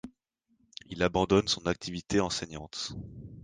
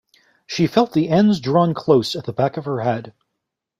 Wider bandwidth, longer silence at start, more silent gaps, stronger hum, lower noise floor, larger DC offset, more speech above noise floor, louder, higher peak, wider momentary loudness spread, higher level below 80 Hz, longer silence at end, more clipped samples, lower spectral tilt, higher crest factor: second, 10 kHz vs 14 kHz; second, 0.05 s vs 0.5 s; neither; neither; second, -74 dBFS vs -80 dBFS; neither; second, 44 dB vs 62 dB; second, -30 LUFS vs -19 LUFS; second, -10 dBFS vs -2 dBFS; first, 21 LU vs 8 LU; about the same, -52 dBFS vs -56 dBFS; second, 0 s vs 0.7 s; neither; second, -4.5 dB/octave vs -7 dB/octave; about the same, 20 dB vs 18 dB